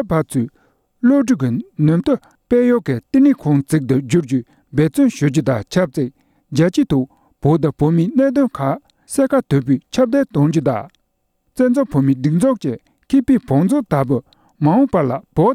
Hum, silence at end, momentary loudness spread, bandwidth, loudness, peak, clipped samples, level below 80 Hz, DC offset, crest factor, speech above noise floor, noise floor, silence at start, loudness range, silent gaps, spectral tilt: none; 0 s; 8 LU; 14.5 kHz; -17 LUFS; -2 dBFS; under 0.1%; -46 dBFS; under 0.1%; 14 dB; 52 dB; -67 dBFS; 0 s; 2 LU; none; -7.5 dB/octave